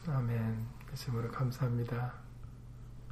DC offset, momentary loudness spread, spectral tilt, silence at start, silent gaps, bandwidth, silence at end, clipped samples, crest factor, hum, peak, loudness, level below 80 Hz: under 0.1%; 17 LU; -7.5 dB/octave; 0 s; none; 14.5 kHz; 0 s; under 0.1%; 14 dB; none; -24 dBFS; -37 LUFS; -52 dBFS